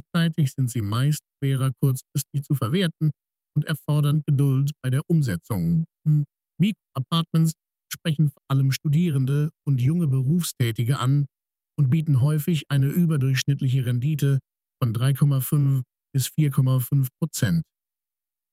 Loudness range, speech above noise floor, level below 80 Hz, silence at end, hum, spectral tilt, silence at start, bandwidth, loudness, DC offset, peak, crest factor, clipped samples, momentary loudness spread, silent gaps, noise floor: 2 LU; over 68 dB; -58 dBFS; 0.9 s; none; -6.5 dB/octave; 0.15 s; 16 kHz; -24 LUFS; under 0.1%; -8 dBFS; 14 dB; under 0.1%; 6 LU; none; under -90 dBFS